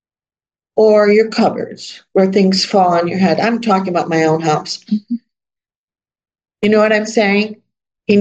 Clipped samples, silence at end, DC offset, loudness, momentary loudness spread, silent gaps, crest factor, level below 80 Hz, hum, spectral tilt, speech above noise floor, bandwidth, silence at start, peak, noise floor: under 0.1%; 0 s; under 0.1%; -14 LUFS; 12 LU; 5.76-5.88 s; 14 dB; -62 dBFS; none; -5.5 dB/octave; over 77 dB; 8.6 kHz; 0.75 s; 0 dBFS; under -90 dBFS